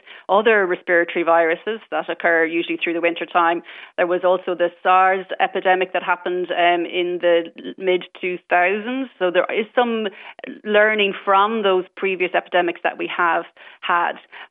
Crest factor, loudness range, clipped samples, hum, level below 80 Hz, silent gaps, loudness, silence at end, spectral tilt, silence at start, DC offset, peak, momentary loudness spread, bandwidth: 16 dB; 2 LU; under 0.1%; none; -76 dBFS; none; -19 LUFS; 0.05 s; -8 dB/octave; 0.1 s; under 0.1%; -4 dBFS; 10 LU; 4 kHz